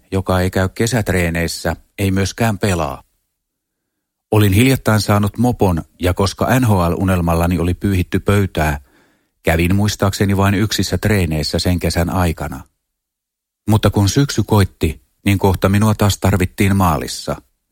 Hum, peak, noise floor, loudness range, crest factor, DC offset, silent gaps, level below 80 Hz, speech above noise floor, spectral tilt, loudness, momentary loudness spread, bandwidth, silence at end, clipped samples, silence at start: none; 0 dBFS; -80 dBFS; 3 LU; 16 dB; under 0.1%; none; -32 dBFS; 65 dB; -6 dB/octave; -16 LUFS; 8 LU; 17 kHz; 0.35 s; under 0.1%; 0.1 s